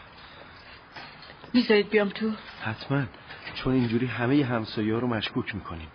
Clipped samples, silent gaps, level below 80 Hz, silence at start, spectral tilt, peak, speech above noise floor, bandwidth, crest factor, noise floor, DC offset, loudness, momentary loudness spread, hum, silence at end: under 0.1%; none; -54 dBFS; 0 s; -5 dB/octave; -10 dBFS; 22 dB; 5.4 kHz; 18 dB; -48 dBFS; under 0.1%; -27 LUFS; 23 LU; none; 0.05 s